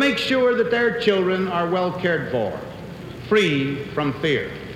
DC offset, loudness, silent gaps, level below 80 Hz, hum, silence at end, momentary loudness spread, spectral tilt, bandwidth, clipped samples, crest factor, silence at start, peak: under 0.1%; -21 LUFS; none; -50 dBFS; none; 0 s; 13 LU; -6 dB/octave; 15 kHz; under 0.1%; 16 dB; 0 s; -4 dBFS